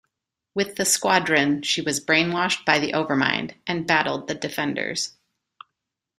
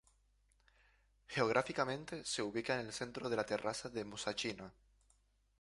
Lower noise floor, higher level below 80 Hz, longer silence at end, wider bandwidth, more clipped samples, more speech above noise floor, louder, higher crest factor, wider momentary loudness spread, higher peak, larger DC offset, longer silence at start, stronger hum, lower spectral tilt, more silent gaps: first, -82 dBFS vs -74 dBFS; first, -64 dBFS vs -70 dBFS; first, 1.1 s vs 0.9 s; first, 15.5 kHz vs 11.5 kHz; neither; first, 59 dB vs 35 dB; first, -22 LUFS vs -39 LUFS; about the same, 22 dB vs 26 dB; about the same, 9 LU vs 9 LU; first, -2 dBFS vs -16 dBFS; neither; second, 0.55 s vs 1.3 s; neither; about the same, -3 dB/octave vs -3.5 dB/octave; neither